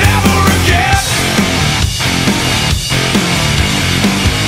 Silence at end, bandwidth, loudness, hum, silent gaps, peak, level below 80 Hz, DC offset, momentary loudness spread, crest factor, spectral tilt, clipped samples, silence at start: 0 s; 16.5 kHz; -11 LUFS; none; none; 0 dBFS; -22 dBFS; under 0.1%; 3 LU; 12 dB; -3.5 dB/octave; under 0.1%; 0 s